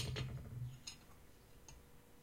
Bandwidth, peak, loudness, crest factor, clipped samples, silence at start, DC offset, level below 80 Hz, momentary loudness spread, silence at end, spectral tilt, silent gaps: 16 kHz; -30 dBFS; -50 LUFS; 20 dB; under 0.1%; 0 s; under 0.1%; -60 dBFS; 18 LU; 0 s; -4.5 dB/octave; none